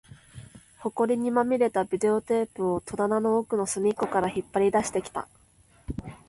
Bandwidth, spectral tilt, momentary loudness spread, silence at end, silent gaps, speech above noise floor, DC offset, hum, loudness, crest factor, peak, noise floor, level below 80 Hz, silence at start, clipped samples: 11.5 kHz; -5.5 dB/octave; 14 LU; 0.1 s; none; 34 dB; under 0.1%; none; -26 LUFS; 16 dB; -10 dBFS; -59 dBFS; -54 dBFS; 0.1 s; under 0.1%